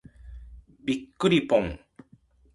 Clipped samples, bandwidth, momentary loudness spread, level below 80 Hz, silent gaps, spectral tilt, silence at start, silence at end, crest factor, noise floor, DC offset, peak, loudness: under 0.1%; 11.5 kHz; 25 LU; -48 dBFS; none; -6 dB/octave; 0.25 s; 0.75 s; 20 dB; -59 dBFS; under 0.1%; -8 dBFS; -26 LUFS